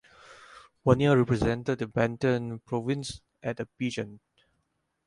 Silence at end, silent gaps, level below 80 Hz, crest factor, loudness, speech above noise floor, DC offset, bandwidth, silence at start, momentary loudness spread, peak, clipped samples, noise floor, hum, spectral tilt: 0.9 s; none; -52 dBFS; 22 dB; -28 LUFS; 50 dB; under 0.1%; 11.5 kHz; 0.3 s; 14 LU; -8 dBFS; under 0.1%; -77 dBFS; none; -7 dB/octave